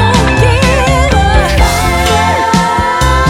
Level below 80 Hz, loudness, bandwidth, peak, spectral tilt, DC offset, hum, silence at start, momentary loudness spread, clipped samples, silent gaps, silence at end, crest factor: -16 dBFS; -9 LUFS; 16.5 kHz; 0 dBFS; -5 dB/octave; under 0.1%; none; 0 s; 2 LU; under 0.1%; none; 0 s; 8 dB